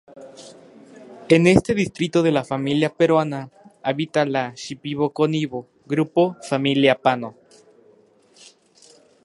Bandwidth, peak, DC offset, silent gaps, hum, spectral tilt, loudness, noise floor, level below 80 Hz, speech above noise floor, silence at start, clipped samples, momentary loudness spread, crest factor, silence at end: 11.5 kHz; 0 dBFS; under 0.1%; none; none; -6 dB/octave; -20 LUFS; -55 dBFS; -52 dBFS; 35 dB; 0.15 s; under 0.1%; 15 LU; 22 dB; 1.95 s